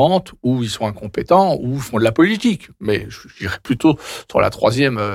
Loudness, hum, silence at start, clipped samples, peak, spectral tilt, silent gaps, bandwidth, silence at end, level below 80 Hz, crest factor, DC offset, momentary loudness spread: -18 LUFS; none; 0 s; under 0.1%; -4 dBFS; -6 dB/octave; none; 15.5 kHz; 0 s; -46 dBFS; 14 dB; under 0.1%; 11 LU